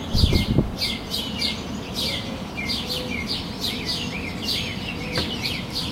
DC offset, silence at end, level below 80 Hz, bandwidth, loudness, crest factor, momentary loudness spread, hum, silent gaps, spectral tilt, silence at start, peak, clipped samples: under 0.1%; 0 s; -34 dBFS; 16 kHz; -25 LUFS; 20 dB; 7 LU; none; none; -4.5 dB/octave; 0 s; -6 dBFS; under 0.1%